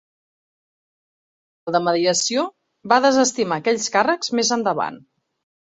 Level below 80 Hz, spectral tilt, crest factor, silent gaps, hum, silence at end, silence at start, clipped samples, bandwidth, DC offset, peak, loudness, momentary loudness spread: -68 dBFS; -2.5 dB/octave; 20 dB; none; none; 0.6 s; 1.65 s; under 0.1%; 8.4 kHz; under 0.1%; -2 dBFS; -19 LUFS; 8 LU